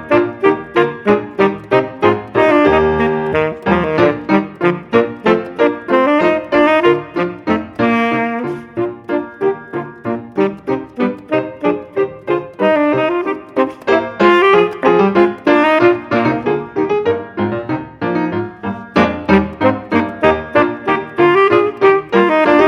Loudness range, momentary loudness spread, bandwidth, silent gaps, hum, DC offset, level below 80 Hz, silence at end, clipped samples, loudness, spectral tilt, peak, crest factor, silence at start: 6 LU; 9 LU; 7.2 kHz; none; none; under 0.1%; -46 dBFS; 0 s; under 0.1%; -15 LUFS; -7.5 dB/octave; 0 dBFS; 14 dB; 0 s